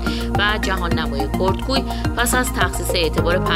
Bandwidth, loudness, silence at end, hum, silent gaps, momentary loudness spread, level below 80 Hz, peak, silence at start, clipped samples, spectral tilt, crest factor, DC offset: 16 kHz; -19 LUFS; 0 s; none; none; 3 LU; -26 dBFS; -2 dBFS; 0 s; under 0.1%; -4.5 dB/octave; 18 dB; under 0.1%